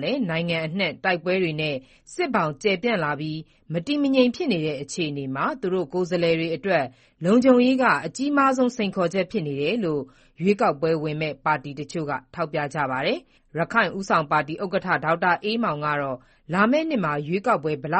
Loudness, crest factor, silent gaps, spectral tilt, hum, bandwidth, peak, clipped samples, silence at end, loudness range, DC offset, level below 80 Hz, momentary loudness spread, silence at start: -23 LUFS; 20 dB; none; -6 dB/octave; none; 8.4 kHz; -4 dBFS; under 0.1%; 0 s; 4 LU; under 0.1%; -60 dBFS; 9 LU; 0 s